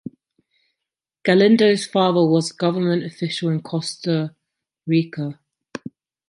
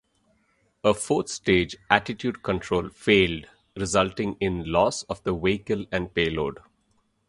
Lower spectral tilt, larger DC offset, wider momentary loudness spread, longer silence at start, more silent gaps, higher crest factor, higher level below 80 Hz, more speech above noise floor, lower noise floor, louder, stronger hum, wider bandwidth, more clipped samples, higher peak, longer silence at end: first, -6 dB/octave vs -4.5 dB/octave; neither; first, 21 LU vs 9 LU; first, 1.25 s vs 0.85 s; neither; second, 18 dB vs 24 dB; second, -68 dBFS vs -46 dBFS; first, 66 dB vs 44 dB; first, -85 dBFS vs -68 dBFS; first, -20 LUFS vs -25 LUFS; neither; about the same, 11 kHz vs 11.5 kHz; neither; about the same, -2 dBFS vs 0 dBFS; first, 0.95 s vs 0.75 s